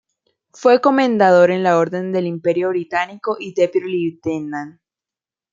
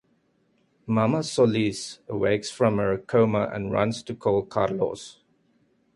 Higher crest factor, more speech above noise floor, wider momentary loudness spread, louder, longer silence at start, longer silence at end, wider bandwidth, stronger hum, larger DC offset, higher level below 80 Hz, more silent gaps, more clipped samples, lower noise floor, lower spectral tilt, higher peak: about the same, 16 dB vs 18 dB; first, 73 dB vs 43 dB; first, 12 LU vs 9 LU; first, -17 LUFS vs -25 LUFS; second, 0.6 s vs 0.85 s; about the same, 0.8 s vs 0.85 s; second, 7.6 kHz vs 11.5 kHz; neither; neither; second, -66 dBFS vs -56 dBFS; neither; neither; first, -90 dBFS vs -67 dBFS; about the same, -6.5 dB/octave vs -6 dB/octave; first, -2 dBFS vs -6 dBFS